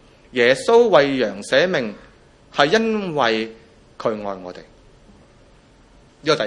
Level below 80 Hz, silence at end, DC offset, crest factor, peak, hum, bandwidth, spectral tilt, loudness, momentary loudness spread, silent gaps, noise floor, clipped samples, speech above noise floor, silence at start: -56 dBFS; 0 s; under 0.1%; 20 dB; 0 dBFS; none; 11 kHz; -4.5 dB/octave; -18 LUFS; 16 LU; none; -50 dBFS; under 0.1%; 32 dB; 0.35 s